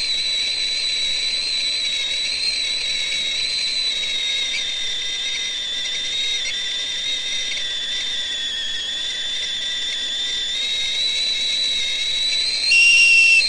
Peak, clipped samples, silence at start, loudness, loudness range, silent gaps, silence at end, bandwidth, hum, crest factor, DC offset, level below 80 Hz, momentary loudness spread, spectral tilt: -4 dBFS; under 0.1%; 0 s; -18 LUFS; 4 LU; none; 0 s; 11.5 kHz; none; 16 dB; under 0.1%; -50 dBFS; 6 LU; 2 dB/octave